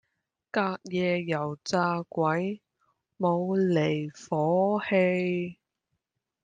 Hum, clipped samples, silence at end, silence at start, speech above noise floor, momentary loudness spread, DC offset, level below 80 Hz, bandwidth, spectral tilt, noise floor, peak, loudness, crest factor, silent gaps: none; under 0.1%; 0.9 s; 0.55 s; 55 dB; 8 LU; under 0.1%; -72 dBFS; 9.2 kHz; -6.5 dB/octave; -82 dBFS; -12 dBFS; -28 LUFS; 16 dB; none